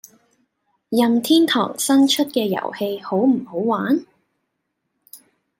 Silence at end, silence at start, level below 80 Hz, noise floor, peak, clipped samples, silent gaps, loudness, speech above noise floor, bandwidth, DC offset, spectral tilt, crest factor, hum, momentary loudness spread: 0.45 s; 0.9 s; -70 dBFS; -75 dBFS; -4 dBFS; under 0.1%; none; -19 LUFS; 57 dB; 16.5 kHz; under 0.1%; -4 dB/octave; 16 dB; none; 8 LU